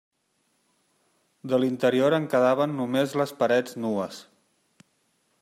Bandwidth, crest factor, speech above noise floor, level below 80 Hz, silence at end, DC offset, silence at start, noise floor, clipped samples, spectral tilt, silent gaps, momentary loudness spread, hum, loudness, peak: 15.5 kHz; 18 dB; 48 dB; -76 dBFS; 1.2 s; under 0.1%; 1.45 s; -72 dBFS; under 0.1%; -6 dB/octave; none; 9 LU; none; -24 LUFS; -8 dBFS